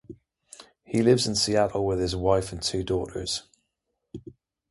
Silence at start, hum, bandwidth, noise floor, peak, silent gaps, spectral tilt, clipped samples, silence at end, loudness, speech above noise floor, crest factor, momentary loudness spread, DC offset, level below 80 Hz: 0.1 s; none; 11.5 kHz; -80 dBFS; -6 dBFS; none; -4.5 dB/octave; under 0.1%; 0.4 s; -25 LUFS; 55 dB; 20 dB; 21 LU; under 0.1%; -46 dBFS